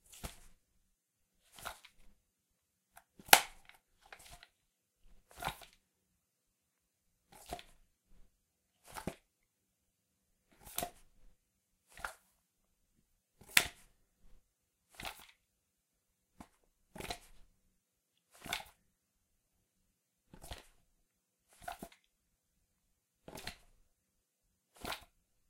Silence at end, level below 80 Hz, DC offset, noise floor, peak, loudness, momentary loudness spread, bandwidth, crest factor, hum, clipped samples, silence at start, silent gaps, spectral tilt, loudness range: 0.5 s; -66 dBFS; under 0.1%; -83 dBFS; -2 dBFS; -36 LUFS; 26 LU; 16 kHz; 42 dB; none; under 0.1%; 0.1 s; none; -0.5 dB/octave; 21 LU